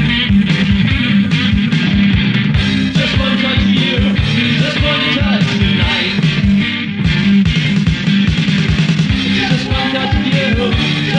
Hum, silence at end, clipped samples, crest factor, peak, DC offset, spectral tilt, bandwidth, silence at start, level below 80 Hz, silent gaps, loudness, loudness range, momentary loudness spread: none; 0 s; under 0.1%; 10 dB; -2 dBFS; under 0.1%; -6 dB/octave; 9.4 kHz; 0 s; -26 dBFS; none; -13 LUFS; 1 LU; 2 LU